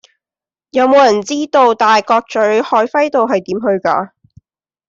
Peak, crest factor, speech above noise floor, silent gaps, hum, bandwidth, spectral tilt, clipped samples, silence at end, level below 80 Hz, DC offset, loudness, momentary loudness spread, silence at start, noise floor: -2 dBFS; 12 dB; over 78 dB; none; none; 7.8 kHz; -4 dB/octave; under 0.1%; 0.8 s; -60 dBFS; under 0.1%; -13 LUFS; 7 LU; 0.75 s; under -90 dBFS